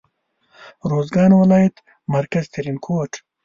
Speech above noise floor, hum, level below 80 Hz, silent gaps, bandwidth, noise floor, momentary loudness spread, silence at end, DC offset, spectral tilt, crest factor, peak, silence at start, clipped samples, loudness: 48 dB; none; -54 dBFS; none; 7.4 kHz; -65 dBFS; 15 LU; 0.25 s; under 0.1%; -8 dB/octave; 16 dB; -2 dBFS; 0.6 s; under 0.1%; -18 LUFS